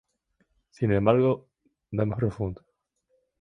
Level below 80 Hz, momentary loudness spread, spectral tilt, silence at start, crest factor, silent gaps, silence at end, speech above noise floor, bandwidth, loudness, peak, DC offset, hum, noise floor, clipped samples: -52 dBFS; 13 LU; -9.5 dB/octave; 0.8 s; 22 dB; none; 0.85 s; 49 dB; 6.4 kHz; -26 LUFS; -6 dBFS; under 0.1%; none; -73 dBFS; under 0.1%